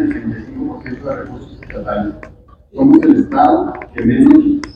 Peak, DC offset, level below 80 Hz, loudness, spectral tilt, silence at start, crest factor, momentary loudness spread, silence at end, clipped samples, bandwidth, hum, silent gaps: 0 dBFS; under 0.1%; -38 dBFS; -13 LUFS; -8.5 dB/octave; 0 s; 14 dB; 18 LU; 0.05 s; 0.6%; 6.6 kHz; none; none